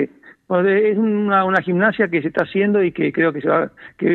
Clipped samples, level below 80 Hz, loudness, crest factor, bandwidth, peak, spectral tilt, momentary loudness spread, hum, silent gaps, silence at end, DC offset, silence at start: under 0.1%; -62 dBFS; -18 LUFS; 14 dB; 4.9 kHz; -4 dBFS; -9 dB/octave; 5 LU; none; none; 0 s; under 0.1%; 0 s